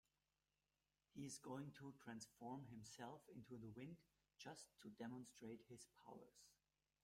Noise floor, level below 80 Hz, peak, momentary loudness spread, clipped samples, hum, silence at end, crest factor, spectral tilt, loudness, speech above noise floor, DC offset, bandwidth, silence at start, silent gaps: under -90 dBFS; -88 dBFS; -42 dBFS; 9 LU; under 0.1%; none; 0.5 s; 16 dB; -5 dB/octave; -59 LUFS; over 32 dB; under 0.1%; 16 kHz; 1.15 s; none